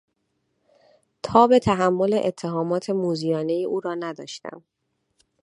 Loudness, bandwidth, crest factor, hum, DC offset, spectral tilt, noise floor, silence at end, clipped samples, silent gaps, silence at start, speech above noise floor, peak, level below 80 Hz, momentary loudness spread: -22 LUFS; 11.5 kHz; 22 dB; none; under 0.1%; -6.5 dB/octave; -73 dBFS; 0.85 s; under 0.1%; none; 1.25 s; 52 dB; -2 dBFS; -56 dBFS; 18 LU